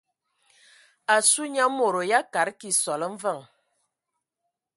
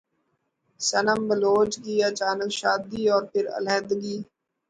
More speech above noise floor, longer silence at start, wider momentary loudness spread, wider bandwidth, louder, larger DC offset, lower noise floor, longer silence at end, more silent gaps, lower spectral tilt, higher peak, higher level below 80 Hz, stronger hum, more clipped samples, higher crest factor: first, 59 dB vs 50 dB; first, 1.1 s vs 0.8 s; first, 12 LU vs 7 LU; first, 12 kHz vs 9.6 kHz; about the same, -23 LUFS vs -24 LUFS; neither; first, -83 dBFS vs -74 dBFS; first, 1.35 s vs 0.45 s; neither; second, -1 dB/octave vs -3 dB/octave; about the same, -8 dBFS vs -8 dBFS; second, -82 dBFS vs -64 dBFS; neither; neither; about the same, 20 dB vs 16 dB